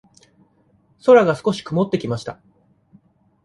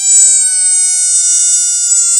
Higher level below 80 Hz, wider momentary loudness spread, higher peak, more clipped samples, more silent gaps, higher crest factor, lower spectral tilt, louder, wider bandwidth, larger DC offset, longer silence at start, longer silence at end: about the same, -60 dBFS vs -60 dBFS; first, 14 LU vs 3 LU; about the same, -2 dBFS vs 0 dBFS; second, under 0.1% vs 0.2%; neither; first, 18 dB vs 10 dB; first, -6.5 dB/octave vs 6 dB/octave; second, -18 LUFS vs -6 LUFS; second, 11.5 kHz vs over 20 kHz; neither; first, 1.05 s vs 0 s; first, 1.1 s vs 0 s